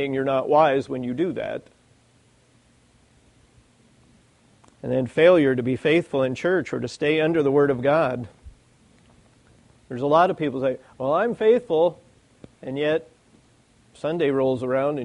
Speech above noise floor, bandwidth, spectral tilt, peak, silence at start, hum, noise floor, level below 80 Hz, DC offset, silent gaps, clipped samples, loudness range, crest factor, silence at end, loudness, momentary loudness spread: 38 dB; 10.5 kHz; -7 dB/octave; -4 dBFS; 0 s; none; -59 dBFS; -60 dBFS; under 0.1%; none; under 0.1%; 6 LU; 18 dB; 0 s; -22 LUFS; 12 LU